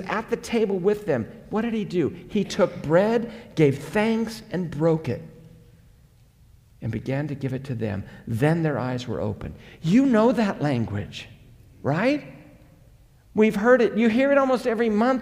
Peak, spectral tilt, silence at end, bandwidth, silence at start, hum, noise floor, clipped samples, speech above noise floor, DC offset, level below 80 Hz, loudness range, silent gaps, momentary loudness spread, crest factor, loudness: -6 dBFS; -7 dB/octave; 0 s; 15 kHz; 0 s; none; -55 dBFS; under 0.1%; 32 dB; under 0.1%; -52 dBFS; 7 LU; none; 13 LU; 18 dB; -23 LUFS